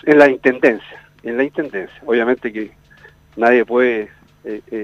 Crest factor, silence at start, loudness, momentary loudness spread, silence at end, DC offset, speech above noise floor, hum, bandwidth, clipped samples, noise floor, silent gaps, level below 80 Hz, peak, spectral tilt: 16 dB; 0.05 s; -16 LUFS; 19 LU; 0 s; under 0.1%; 31 dB; 50 Hz at -55 dBFS; 8.6 kHz; under 0.1%; -46 dBFS; none; -56 dBFS; 0 dBFS; -6.5 dB/octave